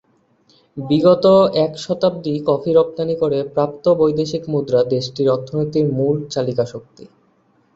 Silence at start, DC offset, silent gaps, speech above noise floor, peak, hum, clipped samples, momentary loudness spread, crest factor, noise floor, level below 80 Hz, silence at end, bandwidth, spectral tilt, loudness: 0.75 s; under 0.1%; none; 42 dB; -2 dBFS; none; under 0.1%; 9 LU; 16 dB; -58 dBFS; -56 dBFS; 0.7 s; 7.8 kHz; -7.5 dB/octave; -17 LUFS